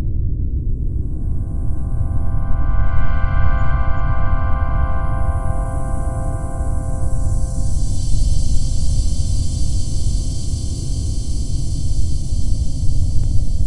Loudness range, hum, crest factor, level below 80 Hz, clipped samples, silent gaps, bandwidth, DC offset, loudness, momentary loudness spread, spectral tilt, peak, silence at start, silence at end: 2 LU; none; 12 dB; -20 dBFS; under 0.1%; none; 11 kHz; under 0.1%; -22 LUFS; 3 LU; -6 dB/octave; -2 dBFS; 0 s; 0 s